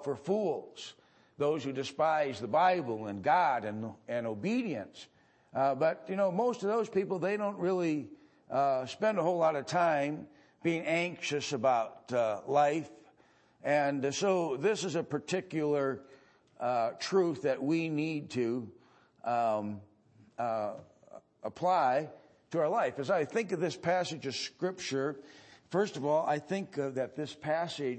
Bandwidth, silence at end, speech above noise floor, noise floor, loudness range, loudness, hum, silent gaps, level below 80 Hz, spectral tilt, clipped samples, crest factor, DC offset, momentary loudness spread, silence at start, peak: 8.8 kHz; 0 s; 34 dB; -65 dBFS; 3 LU; -32 LUFS; none; none; -80 dBFS; -5.5 dB/octave; under 0.1%; 16 dB; under 0.1%; 11 LU; 0 s; -16 dBFS